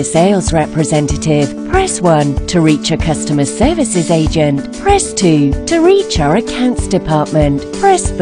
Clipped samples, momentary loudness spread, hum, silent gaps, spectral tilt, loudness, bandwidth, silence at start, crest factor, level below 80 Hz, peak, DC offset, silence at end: 0.1%; 4 LU; none; none; -5.5 dB/octave; -12 LUFS; 11 kHz; 0 s; 12 dB; -26 dBFS; 0 dBFS; under 0.1%; 0 s